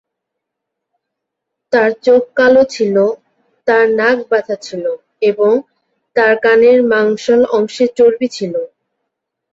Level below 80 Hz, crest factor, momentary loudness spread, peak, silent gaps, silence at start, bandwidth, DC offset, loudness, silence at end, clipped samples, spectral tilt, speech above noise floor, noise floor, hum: -58 dBFS; 12 dB; 12 LU; -2 dBFS; none; 1.7 s; 7.8 kHz; under 0.1%; -13 LUFS; 0.9 s; under 0.1%; -5 dB/octave; 66 dB; -78 dBFS; none